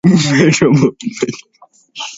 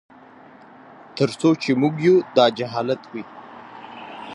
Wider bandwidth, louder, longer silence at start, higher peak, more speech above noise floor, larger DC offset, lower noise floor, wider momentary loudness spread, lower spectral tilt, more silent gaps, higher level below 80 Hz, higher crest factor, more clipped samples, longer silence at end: second, 8 kHz vs 11 kHz; first, -13 LUFS vs -20 LUFS; second, 0.05 s vs 1.15 s; about the same, 0 dBFS vs -2 dBFS; second, 23 dB vs 27 dB; neither; second, -35 dBFS vs -46 dBFS; second, 19 LU vs 22 LU; about the same, -5.5 dB/octave vs -6.5 dB/octave; neither; first, -50 dBFS vs -68 dBFS; second, 14 dB vs 20 dB; neither; about the same, 0 s vs 0 s